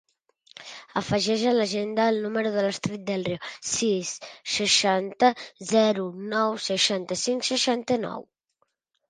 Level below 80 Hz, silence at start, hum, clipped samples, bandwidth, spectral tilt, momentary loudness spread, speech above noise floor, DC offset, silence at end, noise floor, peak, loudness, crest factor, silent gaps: -64 dBFS; 0.6 s; none; under 0.1%; 10 kHz; -3 dB/octave; 11 LU; 49 dB; under 0.1%; 0.85 s; -74 dBFS; -6 dBFS; -25 LUFS; 20 dB; none